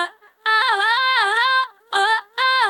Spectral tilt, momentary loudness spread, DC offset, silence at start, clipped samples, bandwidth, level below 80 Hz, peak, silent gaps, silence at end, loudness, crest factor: 2.5 dB/octave; 6 LU; under 0.1%; 0 s; under 0.1%; 17.5 kHz; -84 dBFS; -6 dBFS; none; 0 s; -18 LUFS; 14 dB